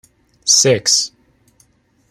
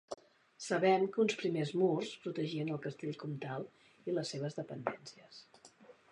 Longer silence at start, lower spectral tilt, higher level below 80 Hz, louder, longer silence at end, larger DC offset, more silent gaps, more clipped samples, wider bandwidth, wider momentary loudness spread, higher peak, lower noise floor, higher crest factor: first, 0.45 s vs 0.1 s; second, -1.5 dB/octave vs -5.5 dB/octave; first, -60 dBFS vs -84 dBFS; first, -13 LUFS vs -36 LUFS; first, 1.05 s vs 0.2 s; neither; neither; neither; first, 16 kHz vs 11 kHz; second, 13 LU vs 19 LU; first, 0 dBFS vs -16 dBFS; second, -56 dBFS vs -61 dBFS; about the same, 18 dB vs 22 dB